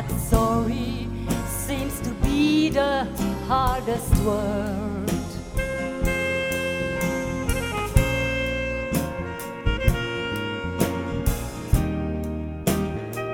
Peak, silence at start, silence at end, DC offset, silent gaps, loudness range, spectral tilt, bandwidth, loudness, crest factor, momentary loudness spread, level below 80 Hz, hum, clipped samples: -4 dBFS; 0 s; 0 s; under 0.1%; none; 3 LU; -5.5 dB/octave; 17.5 kHz; -25 LUFS; 20 dB; 7 LU; -32 dBFS; none; under 0.1%